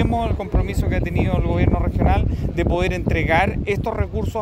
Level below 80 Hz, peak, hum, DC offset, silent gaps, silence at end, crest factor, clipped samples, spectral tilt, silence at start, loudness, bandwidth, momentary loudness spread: -24 dBFS; -4 dBFS; none; under 0.1%; none; 0 s; 16 dB; under 0.1%; -7.5 dB/octave; 0 s; -20 LUFS; 15.5 kHz; 5 LU